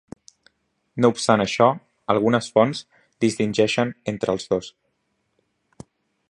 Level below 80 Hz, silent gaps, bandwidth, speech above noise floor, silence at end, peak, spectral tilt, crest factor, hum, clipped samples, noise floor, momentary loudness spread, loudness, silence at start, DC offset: -60 dBFS; none; 11.5 kHz; 52 dB; 1.6 s; -2 dBFS; -5 dB/octave; 22 dB; none; under 0.1%; -72 dBFS; 9 LU; -21 LUFS; 0.95 s; under 0.1%